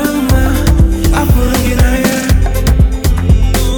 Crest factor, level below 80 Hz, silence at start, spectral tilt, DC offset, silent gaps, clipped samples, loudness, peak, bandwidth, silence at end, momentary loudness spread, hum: 8 dB; -12 dBFS; 0 s; -5.5 dB/octave; under 0.1%; none; under 0.1%; -12 LUFS; 0 dBFS; 19.5 kHz; 0 s; 2 LU; none